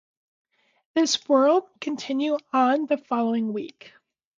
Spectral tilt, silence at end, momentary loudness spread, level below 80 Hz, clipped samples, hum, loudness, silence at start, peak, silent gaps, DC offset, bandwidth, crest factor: -3.5 dB/octave; 0.5 s; 12 LU; -78 dBFS; under 0.1%; none; -24 LUFS; 0.95 s; -8 dBFS; none; under 0.1%; 9.4 kHz; 16 dB